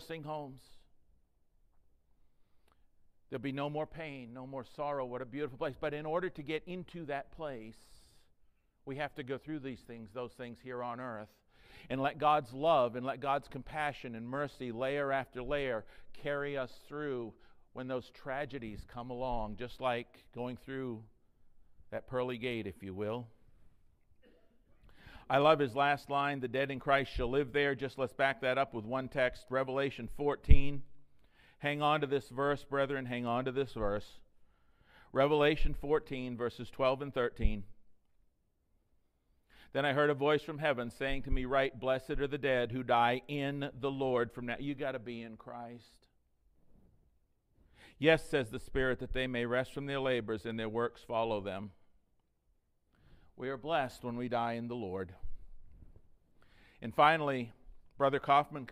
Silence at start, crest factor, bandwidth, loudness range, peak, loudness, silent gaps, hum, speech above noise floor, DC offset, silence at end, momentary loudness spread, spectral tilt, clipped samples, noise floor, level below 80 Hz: 0 s; 28 dB; 12 kHz; 10 LU; -8 dBFS; -35 LUFS; none; none; 41 dB; under 0.1%; 0 s; 15 LU; -6.5 dB/octave; under 0.1%; -75 dBFS; -44 dBFS